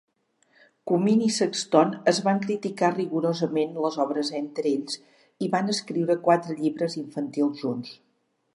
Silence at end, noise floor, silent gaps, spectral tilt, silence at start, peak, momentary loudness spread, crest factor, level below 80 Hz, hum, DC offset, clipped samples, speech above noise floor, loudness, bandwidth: 0.6 s; -71 dBFS; none; -5 dB/octave; 0.85 s; -4 dBFS; 10 LU; 22 dB; -78 dBFS; none; under 0.1%; under 0.1%; 47 dB; -25 LUFS; 11.5 kHz